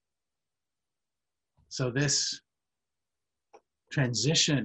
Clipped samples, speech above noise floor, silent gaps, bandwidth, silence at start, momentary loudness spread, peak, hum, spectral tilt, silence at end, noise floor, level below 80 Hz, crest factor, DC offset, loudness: under 0.1%; over 62 dB; none; 9.2 kHz; 1.7 s; 14 LU; -12 dBFS; none; -3.5 dB/octave; 0 s; under -90 dBFS; -66 dBFS; 20 dB; under 0.1%; -28 LUFS